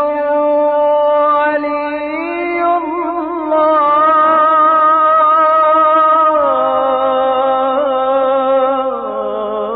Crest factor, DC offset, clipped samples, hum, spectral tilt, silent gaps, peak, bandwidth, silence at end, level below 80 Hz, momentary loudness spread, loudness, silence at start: 10 dB; under 0.1%; under 0.1%; none; -8 dB/octave; none; -4 dBFS; 4.7 kHz; 0 s; -52 dBFS; 9 LU; -12 LUFS; 0 s